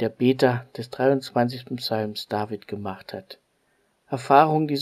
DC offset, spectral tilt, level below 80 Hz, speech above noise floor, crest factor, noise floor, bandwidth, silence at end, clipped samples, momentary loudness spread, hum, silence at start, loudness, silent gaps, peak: under 0.1%; -6.5 dB/octave; -68 dBFS; 44 dB; 22 dB; -68 dBFS; 15 kHz; 0 s; under 0.1%; 17 LU; none; 0 s; -23 LUFS; none; -2 dBFS